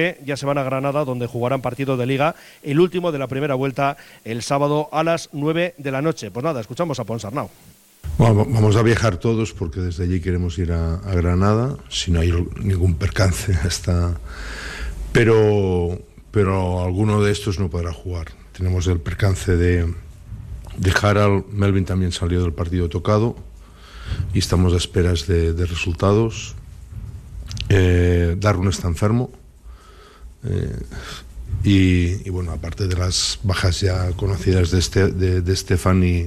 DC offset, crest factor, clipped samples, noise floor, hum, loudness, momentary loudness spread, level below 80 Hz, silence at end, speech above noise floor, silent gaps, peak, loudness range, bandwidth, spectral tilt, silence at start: under 0.1%; 16 dB; under 0.1%; -44 dBFS; none; -20 LUFS; 14 LU; -32 dBFS; 0 s; 25 dB; none; -4 dBFS; 3 LU; 13.5 kHz; -6 dB/octave; 0 s